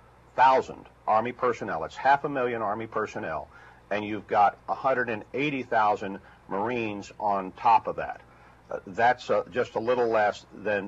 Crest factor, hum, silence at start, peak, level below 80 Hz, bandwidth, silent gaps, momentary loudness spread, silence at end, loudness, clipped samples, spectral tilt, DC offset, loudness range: 18 dB; none; 0.35 s; -8 dBFS; -60 dBFS; 8 kHz; none; 13 LU; 0 s; -27 LUFS; under 0.1%; -5.5 dB/octave; under 0.1%; 2 LU